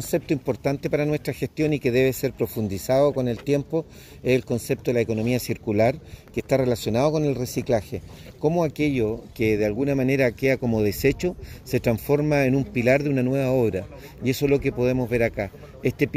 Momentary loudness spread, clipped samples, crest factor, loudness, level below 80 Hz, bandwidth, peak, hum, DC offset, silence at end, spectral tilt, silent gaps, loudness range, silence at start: 8 LU; under 0.1%; 18 dB; -23 LUFS; -46 dBFS; 16 kHz; -4 dBFS; none; under 0.1%; 0 s; -6.5 dB/octave; none; 2 LU; 0 s